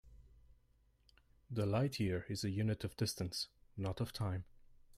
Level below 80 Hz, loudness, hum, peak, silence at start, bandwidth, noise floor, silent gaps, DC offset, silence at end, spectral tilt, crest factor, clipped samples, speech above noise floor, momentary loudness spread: -64 dBFS; -40 LUFS; none; -24 dBFS; 0.05 s; 15.5 kHz; -72 dBFS; none; under 0.1%; 0 s; -5.5 dB/octave; 16 dB; under 0.1%; 34 dB; 9 LU